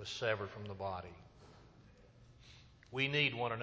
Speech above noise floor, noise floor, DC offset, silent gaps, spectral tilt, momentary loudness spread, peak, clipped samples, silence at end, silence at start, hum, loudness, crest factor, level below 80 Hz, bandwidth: 23 dB; -62 dBFS; under 0.1%; none; -4.5 dB/octave; 27 LU; -20 dBFS; under 0.1%; 0 s; 0 s; none; -37 LUFS; 22 dB; -64 dBFS; 8 kHz